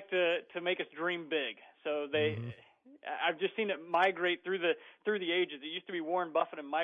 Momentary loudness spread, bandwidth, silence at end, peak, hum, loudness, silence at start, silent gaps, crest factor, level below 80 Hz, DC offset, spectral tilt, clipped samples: 11 LU; 7 kHz; 0 s; -16 dBFS; none; -34 LUFS; 0 s; none; 18 dB; -82 dBFS; under 0.1%; -6.5 dB/octave; under 0.1%